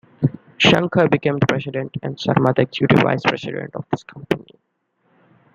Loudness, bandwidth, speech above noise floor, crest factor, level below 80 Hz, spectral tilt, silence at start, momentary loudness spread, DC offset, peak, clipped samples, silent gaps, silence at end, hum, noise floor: -19 LUFS; 7.6 kHz; 50 dB; 20 dB; -54 dBFS; -6.5 dB/octave; 0.2 s; 12 LU; under 0.1%; 0 dBFS; under 0.1%; none; 1.15 s; none; -69 dBFS